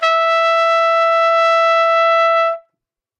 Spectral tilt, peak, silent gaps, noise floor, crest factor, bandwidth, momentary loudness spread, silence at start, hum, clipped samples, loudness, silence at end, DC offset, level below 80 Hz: 4.5 dB/octave; -4 dBFS; none; -79 dBFS; 10 dB; 8.8 kHz; 3 LU; 0 s; none; under 0.1%; -13 LUFS; 0.6 s; under 0.1%; under -90 dBFS